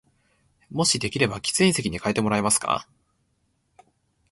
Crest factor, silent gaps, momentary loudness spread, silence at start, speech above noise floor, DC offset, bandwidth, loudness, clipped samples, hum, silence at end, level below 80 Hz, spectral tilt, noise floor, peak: 20 dB; none; 6 LU; 0.7 s; 47 dB; under 0.1%; 12 kHz; -23 LUFS; under 0.1%; none; 1.5 s; -54 dBFS; -3.5 dB/octave; -70 dBFS; -6 dBFS